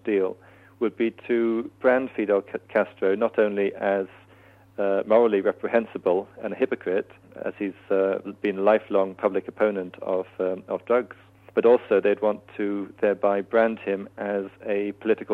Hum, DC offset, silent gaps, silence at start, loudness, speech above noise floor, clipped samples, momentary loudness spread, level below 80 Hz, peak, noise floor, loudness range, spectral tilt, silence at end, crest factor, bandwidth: none; under 0.1%; none; 0.05 s; -25 LUFS; 29 dB; under 0.1%; 9 LU; -70 dBFS; -6 dBFS; -53 dBFS; 2 LU; -8 dB/octave; 0 s; 18 dB; 4.3 kHz